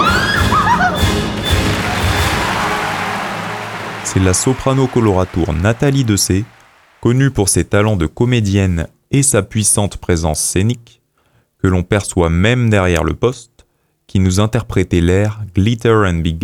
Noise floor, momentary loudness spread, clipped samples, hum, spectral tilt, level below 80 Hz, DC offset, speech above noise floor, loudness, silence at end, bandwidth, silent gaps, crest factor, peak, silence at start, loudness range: -57 dBFS; 7 LU; under 0.1%; none; -5 dB/octave; -30 dBFS; under 0.1%; 44 dB; -15 LUFS; 0 s; 17.5 kHz; none; 14 dB; 0 dBFS; 0 s; 2 LU